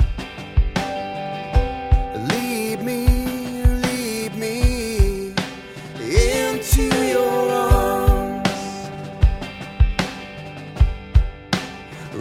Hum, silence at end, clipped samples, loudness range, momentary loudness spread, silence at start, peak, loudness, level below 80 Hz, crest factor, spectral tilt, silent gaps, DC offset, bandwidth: none; 0 s; under 0.1%; 4 LU; 13 LU; 0 s; -2 dBFS; -21 LUFS; -22 dBFS; 18 dB; -5.5 dB/octave; none; under 0.1%; 16.5 kHz